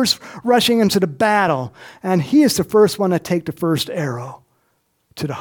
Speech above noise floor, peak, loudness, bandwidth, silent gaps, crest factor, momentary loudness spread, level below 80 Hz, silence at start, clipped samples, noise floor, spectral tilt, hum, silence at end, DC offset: 48 dB; -2 dBFS; -17 LUFS; 19 kHz; none; 16 dB; 13 LU; -56 dBFS; 0 s; under 0.1%; -66 dBFS; -5 dB/octave; none; 0 s; under 0.1%